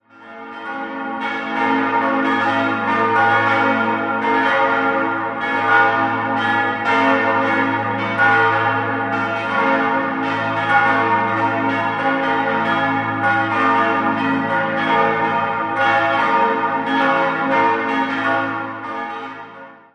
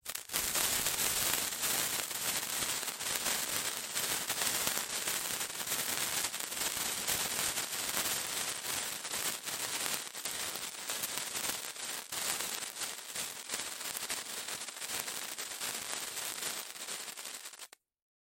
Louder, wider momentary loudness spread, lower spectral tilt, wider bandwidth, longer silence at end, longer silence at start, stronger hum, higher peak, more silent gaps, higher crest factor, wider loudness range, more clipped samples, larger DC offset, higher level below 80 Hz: first, -17 LUFS vs -34 LUFS; about the same, 9 LU vs 8 LU; first, -6 dB/octave vs 0.5 dB/octave; second, 9.6 kHz vs 17 kHz; second, 0.2 s vs 0.65 s; first, 0.2 s vs 0.05 s; neither; first, -2 dBFS vs -6 dBFS; neither; second, 16 dB vs 30 dB; second, 1 LU vs 6 LU; neither; neither; about the same, -62 dBFS vs -66 dBFS